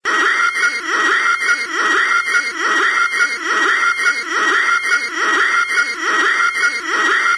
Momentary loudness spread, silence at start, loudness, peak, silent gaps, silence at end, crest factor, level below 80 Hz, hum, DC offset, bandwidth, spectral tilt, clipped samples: 3 LU; 0.05 s; -14 LUFS; -4 dBFS; none; 0 s; 12 dB; -64 dBFS; none; under 0.1%; 11 kHz; 1 dB/octave; under 0.1%